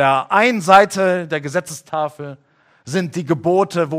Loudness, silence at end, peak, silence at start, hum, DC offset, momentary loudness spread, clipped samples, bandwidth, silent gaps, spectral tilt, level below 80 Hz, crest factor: -17 LUFS; 0 s; 0 dBFS; 0 s; none; under 0.1%; 14 LU; under 0.1%; 16 kHz; none; -5 dB/octave; -60 dBFS; 18 dB